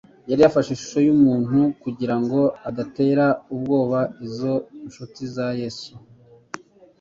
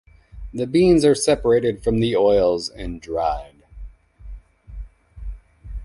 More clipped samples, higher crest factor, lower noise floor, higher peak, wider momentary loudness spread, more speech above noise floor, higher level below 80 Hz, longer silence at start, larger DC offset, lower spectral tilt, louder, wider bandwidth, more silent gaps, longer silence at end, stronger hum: neither; about the same, 18 dB vs 16 dB; about the same, -40 dBFS vs -39 dBFS; about the same, -4 dBFS vs -4 dBFS; about the same, 21 LU vs 23 LU; about the same, 19 dB vs 21 dB; second, -58 dBFS vs -38 dBFS; about the same, 0.25 s vs 0.35 s; neither; first, -7 dB/octave vs -5.5 dB/octave; about the same, -21 LUFS vs -19 LUFS; second, 7.4 kHz vs 11.5 kHz; neither; first, 0.45 s vs 0 s; neither